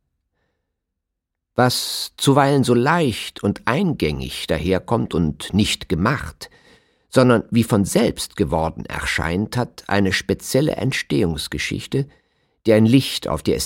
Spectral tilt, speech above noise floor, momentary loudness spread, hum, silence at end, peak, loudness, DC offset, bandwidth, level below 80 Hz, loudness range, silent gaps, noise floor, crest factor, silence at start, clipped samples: -5.5 dB/octave; 61 dB; 9 LU; none; 0 s; -2 dBFS; -20 LUFS; under 0.1%; 16.5 kHz; -42 dBFS; 2 LU; none; -80 dBFS; 18 dB; 1.55 s; under 0.1%